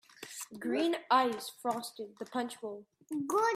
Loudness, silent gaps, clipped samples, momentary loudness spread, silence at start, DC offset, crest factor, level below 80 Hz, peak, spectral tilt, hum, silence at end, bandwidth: -34 LUFS; none; under 0.1%; 16 LU; 0.2 s; under 0.1%; 20 dB; -84 dBFS; -14 dBFS; -3 dB/octave; none; 0 s; 16 kHz